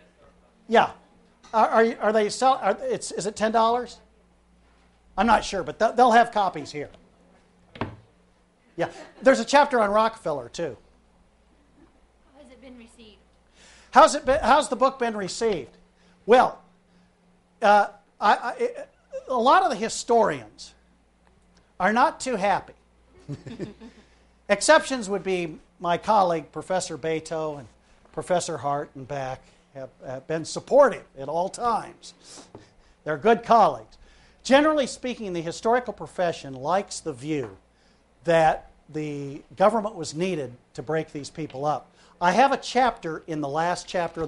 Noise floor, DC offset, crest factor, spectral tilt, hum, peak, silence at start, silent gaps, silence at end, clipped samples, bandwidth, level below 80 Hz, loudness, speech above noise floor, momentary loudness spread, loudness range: -61 dBFS; under 0.1%; 22 dB; -4 dB/octave; none; -2 dBFS; 0.7 s; none; 0 s; under 0.1%; 11.5 kHz; -54 dBFS; -23 LUFS; 38 dB; 18 LU; 5 LU